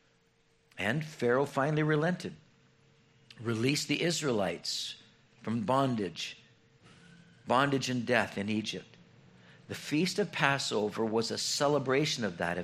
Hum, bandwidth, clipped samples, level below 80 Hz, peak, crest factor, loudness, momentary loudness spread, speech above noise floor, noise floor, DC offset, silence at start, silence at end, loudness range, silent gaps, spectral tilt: none; 14.5 kHz; under 0.1%; -72 dBFS; -8 dBFS; 24 dB; -31 LUFS; 12 LU; 38 dB; -69 dBFS; under 0.1%; 0.75 s; 0 s; 3 LU; none; -4.5 dB/octave